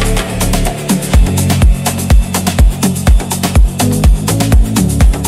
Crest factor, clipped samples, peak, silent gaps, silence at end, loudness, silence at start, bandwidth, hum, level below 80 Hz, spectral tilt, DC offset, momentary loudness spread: 10 dB; under 0.1%; 0 dBFS; none; 0 s; -12 LUFS; 0 s; 16 kHz; none; -12 dBFS; -5 dB/octave; under 0.1%; 4 LU